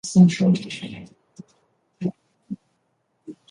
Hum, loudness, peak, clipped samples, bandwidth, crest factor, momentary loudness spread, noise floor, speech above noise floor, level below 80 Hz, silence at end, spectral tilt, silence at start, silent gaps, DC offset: none; -21 LUFS; -4 dBFS; under 0.1%; 10.5 kHz; 20 dB; 25 LU; -71 dBFS; 52 dB; -62 dBFS; 0.2 s; -6.5 dB/octave; 0.05 s; none; under 0.1%